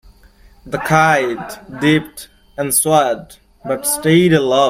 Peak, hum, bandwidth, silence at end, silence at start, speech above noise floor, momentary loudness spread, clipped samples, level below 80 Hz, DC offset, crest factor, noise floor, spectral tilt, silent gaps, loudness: 0 dBFS; none; 16.5 kHz; 0 s; 0.65 s; 31 dB; 19 LU; under 0.1%; -48 dBFS; under 0.1%; 16 dB; -46 dBFS; -4.5 dB/octave; none; -15 LUFS